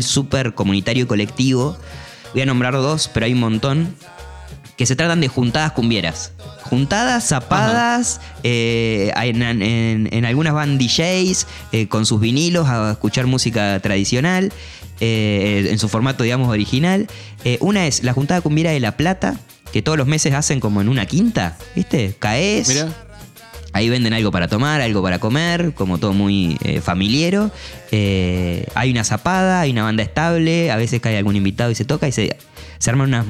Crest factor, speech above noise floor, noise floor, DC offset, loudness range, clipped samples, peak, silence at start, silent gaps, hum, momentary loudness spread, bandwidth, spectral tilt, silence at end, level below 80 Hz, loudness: 16 dB; 22 dB; -39 dBFS; under 0.1%; 2 LU; under 0.1%; -2 dBFS; 0 s; none; none; 7 LU; 15 kHz; -5 dB/octave; 0 s; -40 dBFS; -17 LUFS